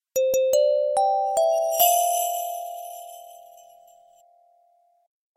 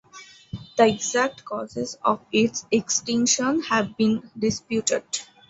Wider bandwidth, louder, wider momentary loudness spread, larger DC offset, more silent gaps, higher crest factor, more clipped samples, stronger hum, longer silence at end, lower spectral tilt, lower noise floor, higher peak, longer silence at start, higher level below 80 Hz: first, 16 kHz vs 8.2 kHz; about the same, -22 LUFS vs -23 LUFS; first, 19 LU vs 11 LU; neither; neither; about the same, 20 dB vs 20 dB; neither; neither; first, 2 s vs 0.25 s; second, 0.5 dB/octave vs -3 dB/octave; first, -63 dBFS vs -47 dBFS; about the same, -4 dBFS vs -4 dBFS; about the same, 0.15 s vs 0.15 s; second, -72 dBFS vs -58 dBFS